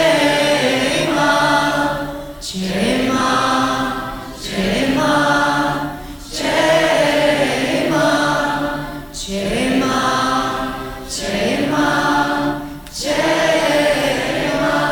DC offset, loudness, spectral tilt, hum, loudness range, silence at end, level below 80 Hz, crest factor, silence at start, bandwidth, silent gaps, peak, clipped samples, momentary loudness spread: under 0.1%; -17 LUFS; -4 dB/octave; none; 3 LU; 0 s; -38 dBFS; 14 dB; 0 s; 19.5 kHz; none; -2 dBFS; under 0.1%; 11 LU